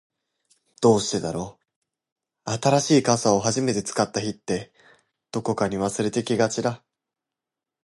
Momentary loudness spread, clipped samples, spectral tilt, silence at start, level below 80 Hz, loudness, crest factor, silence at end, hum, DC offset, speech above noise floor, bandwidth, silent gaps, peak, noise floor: 12 LU; under 0.1%; -4.5 dB/octave; 0.8 s; -58 dBFS; -23 LUFS; 22 dB; 1.05 s; none; under 0.1%; 65 dB; 11.5 kHz; 1.76-1.82 s, 2.12-2.16 s; -4 dBFS; -88 dBFS